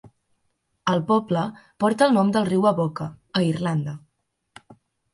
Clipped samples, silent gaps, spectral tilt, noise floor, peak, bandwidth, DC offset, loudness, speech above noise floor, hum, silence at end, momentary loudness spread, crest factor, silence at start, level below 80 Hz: under 0.1%; none; -6.5 dB/octave; -73 dBFS; -4 dBFS; 11.5 kHz; under 0.1%; -22 LUFS; 51 dB; none; 0.4 s; 12 LU; 20 dB; 0.05 s; -62 dBFS